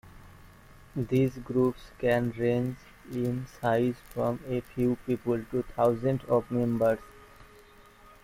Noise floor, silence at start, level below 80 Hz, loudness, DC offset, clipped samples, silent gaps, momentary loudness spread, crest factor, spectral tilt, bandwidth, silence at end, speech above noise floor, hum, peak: -54 dBFS; 0.05 s; -54 dBFS; -29 LUFS; under 0.1%; under 0.1%; none; 7 LU; 16 dB; -8 dB/octave; 16 kHz; 0.8 s; 26 dB; none; -12 dBFS